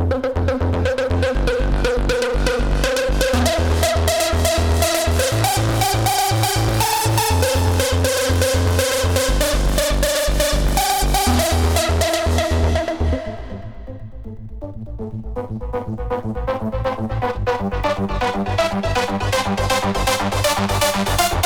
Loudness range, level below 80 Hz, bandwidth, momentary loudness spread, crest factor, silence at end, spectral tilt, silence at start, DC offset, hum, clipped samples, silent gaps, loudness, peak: 8 LU; -24 dBFS; 20 kHz; 11 LU; 16 dB; 0 s; -4 dB/octave; 0 s; under 0.1%; none; under 0.1%; none; -19 LUFS; -2 dBFS